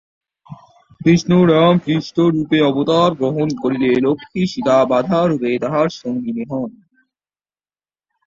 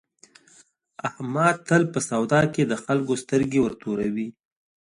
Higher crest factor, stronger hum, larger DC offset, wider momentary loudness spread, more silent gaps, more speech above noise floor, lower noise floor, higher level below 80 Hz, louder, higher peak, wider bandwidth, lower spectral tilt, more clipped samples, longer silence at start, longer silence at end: about the same, 16 dB vs 20 dB; first, 50 Hz at -50 dBFS vs none; neither; about the same, 10 LU vs 11 LU; neither; first, over 75 dB vs 35 dB; first, under -90 dBFS vs -57 dBFS; first, -54 dBFS vs -60 dBFS; first, -16 LUFS vs -24 LUFS; about the same, -2 dBFS vs -4 dBFS; second, 7.6 kHz vs 11.5 kHz; about the same, -7 dB/octave vs -6 dB/octave; neither; second, 0.5 s vs 1.05 s; first, 1.55 s vs 0.6 s